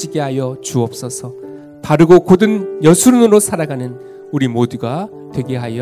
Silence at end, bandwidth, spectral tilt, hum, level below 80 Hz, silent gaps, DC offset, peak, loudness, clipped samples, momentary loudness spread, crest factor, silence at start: 0 s; 16 kHz; -6 dB/octave; none; -50 dBFS; none; under 0.1%; 0 dBFS; -13 LUFS; 0.9%; 18 LU; 14 dB; 0 s